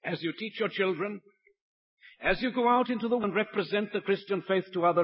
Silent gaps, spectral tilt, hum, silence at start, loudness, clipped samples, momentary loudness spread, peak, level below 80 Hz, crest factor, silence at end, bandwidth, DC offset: 1.61-1.97 s; -9.5 dB/octave; none; 0.05 s; -29 LUFS; under 0.1%; 8 LU; -12 dBFS; -60 dBFS; 18 dB; 0 s; 5.8 kHz; under 0.1%